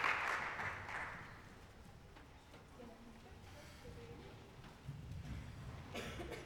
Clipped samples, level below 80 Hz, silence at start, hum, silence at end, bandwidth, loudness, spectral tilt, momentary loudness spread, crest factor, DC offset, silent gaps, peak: under 0.1%; -60 dBFS; 0 s; none; 0 s; 19.5 kHz; -47 LUFS; -4.5 dB/octave; 19 LU; 26 dB; under 0.1%; none; -22 dBFS